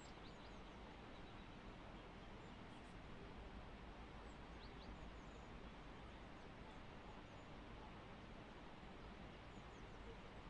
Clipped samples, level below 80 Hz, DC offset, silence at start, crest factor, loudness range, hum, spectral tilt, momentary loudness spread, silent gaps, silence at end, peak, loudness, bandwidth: under 0.1%; -62 dBFS; under 0.1%; 0 s; 14 dB; 0 LU; none; -5.5 dB/octave; 1 LU; none; 0 s; -42 dBFS; -58 LUFS; 10 kHz